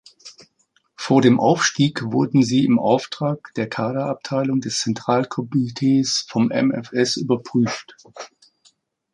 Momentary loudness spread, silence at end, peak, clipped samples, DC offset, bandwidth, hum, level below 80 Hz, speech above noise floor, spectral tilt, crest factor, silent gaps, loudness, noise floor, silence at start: 10 LU; 0.85 s; -2 dBFS; under 0.1%; under 0.1%; 11 kHz; none; -62 dBFS; 45 dB; -5 dB/octave; 18 dB; none; -20 LUFS; -65 dBFS; 0.25 s